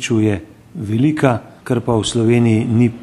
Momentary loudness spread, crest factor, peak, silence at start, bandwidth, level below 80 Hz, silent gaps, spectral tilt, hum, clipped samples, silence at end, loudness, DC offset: 11 LU; 16 dB; 0 dBFS; 0 s; 12 kHz; -46 dBFS; none; -6.5 dB/octave; none; under 0.1%; 0 s; -16 LUFS; under 0.1%